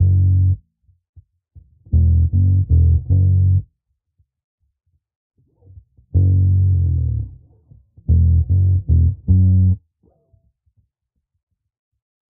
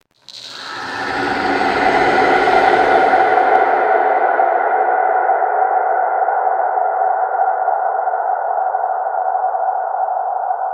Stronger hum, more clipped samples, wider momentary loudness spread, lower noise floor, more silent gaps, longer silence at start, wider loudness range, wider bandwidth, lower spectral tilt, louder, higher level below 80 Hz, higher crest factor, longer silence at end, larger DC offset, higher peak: neither; neither; about the same, 7 LU vs 8 LU; first, -75 dBFS vs -37 dBFS; first, 1.09-1.13 s, 4.44-4.58 s, 5.15-5.30 s vs none; second, 0 s vs 0.3 s; about the same, 4 LU vs 5 LU; second, 0.7 kHz vs 9.2 kHz; first, -19.5 dB/octave vs -4.5 dB/octave; about the same, -16 LUFS vs -15 LUFS; first, -26 dBFS vs -52 dBFS; about the same, 14 dB vs 16 dB; first, 2.5 s vs 0 s; neither; second, -4 dBFS vs 0 dBFS